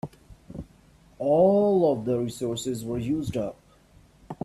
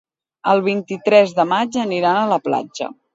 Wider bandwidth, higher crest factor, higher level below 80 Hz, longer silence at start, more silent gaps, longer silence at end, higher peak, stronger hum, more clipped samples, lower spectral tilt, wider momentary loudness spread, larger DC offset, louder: first, 13.5 kHz vs 7.8 kHz; about the same, 18 dB vs 18 dB; first, -54 dBFS vs -68 dBFS; second, 0.05 s vs 0.45 s; neither; about the same, 0.1 s vs 0.2 s; second, -10 dBFS vs 0 dBFS; neither; neither; first, -7 dB/octave vs -5.5 dB/octave; first, 23 LU vs 10 LU; neither; second, -25 LUFS vs -17 LUFS